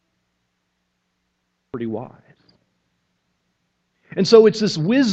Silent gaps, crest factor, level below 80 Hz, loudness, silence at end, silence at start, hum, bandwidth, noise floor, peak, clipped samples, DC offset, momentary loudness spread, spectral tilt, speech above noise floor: none; 22 dB; -66 dBFS; -16 LUFS; 0 s; 1.75 s; none; 8.2 kHz; -72 dBFS; 0 dBFS; under 0.1%; under 0.1%; 19 LU; -5.5 dB/octave; 56 dB